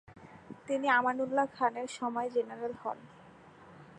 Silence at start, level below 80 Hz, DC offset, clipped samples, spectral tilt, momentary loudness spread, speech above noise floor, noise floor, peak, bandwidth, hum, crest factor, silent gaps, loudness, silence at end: 0.1 s; -76 dBFS; under 0.1%; under 0.1%; -4.5 dB/octave; 19 LU; 23 dB; -55 dBFS; -14 dBFS; 10.5 kHz; none; 20 dB; none; -32 LUFS; 0 s